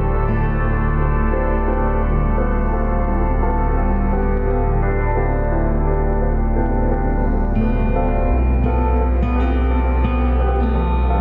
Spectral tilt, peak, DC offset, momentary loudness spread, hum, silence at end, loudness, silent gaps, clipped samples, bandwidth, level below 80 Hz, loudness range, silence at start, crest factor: -11 dB/octave; -6 dBFS; under 0.1%; 2 LU; none; 0 s; -19 LUFS; none; under 0.1%; 3.9 kHz; -18 dBFS; 1 LU; 0 s; 12 dB